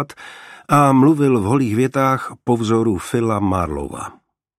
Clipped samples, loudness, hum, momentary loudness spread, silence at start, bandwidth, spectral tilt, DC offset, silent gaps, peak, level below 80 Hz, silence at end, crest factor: under 0.1%; -17 LUFS; none; 18 LU; 0 s; 15 kHz; -7 dB/octave; under 0.1%; none; 0 dBFS; -44 dBFS; 0.5 s; 16 dB